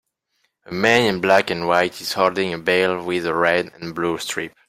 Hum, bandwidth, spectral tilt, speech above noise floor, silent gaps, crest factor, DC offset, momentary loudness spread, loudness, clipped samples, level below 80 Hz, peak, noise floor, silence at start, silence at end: none; 16 kHz; -4 dB/octave; 50 dB; none; 18 dB; under 0.1%; 9 LU; -19 LUFS; under 0.1%; -58 dBFS; -2 dBFS; -70 dBFS; 0.7 s; 0.2 s